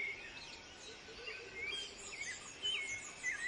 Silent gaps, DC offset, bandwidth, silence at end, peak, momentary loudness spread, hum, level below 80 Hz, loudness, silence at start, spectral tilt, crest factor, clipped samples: none; under 0.1%; 11.5 kHz; 0 s; -28 dBFS; 12 LU; none; -70 dBFS; -43 LUFS; 0 s; 0 dB/octave; 16 dB; under 0.1%